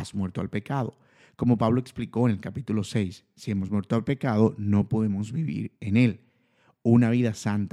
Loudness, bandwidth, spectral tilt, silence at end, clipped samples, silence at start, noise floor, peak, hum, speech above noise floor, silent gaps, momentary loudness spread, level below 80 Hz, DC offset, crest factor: -26 LUFS; 11.5 kHz; -8 dB/octave; 0.05 s; under 0.1%; 0 s; -65 dBFS; -8 dBFS; none; 40 dB; none; 9 LU; -58 dBFS; under 0.1%; 18 dB